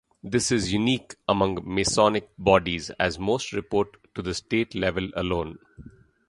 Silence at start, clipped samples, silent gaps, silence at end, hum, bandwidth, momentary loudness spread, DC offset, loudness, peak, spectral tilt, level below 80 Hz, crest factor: 0.25 s; under 0.1%; none; 0.4 s; none; 11.5 kHz; 9 LU; under 0.1%; -25 LUFS; -2 dBFS; -4.5 dB/octave; -46 dBFS; 22 dB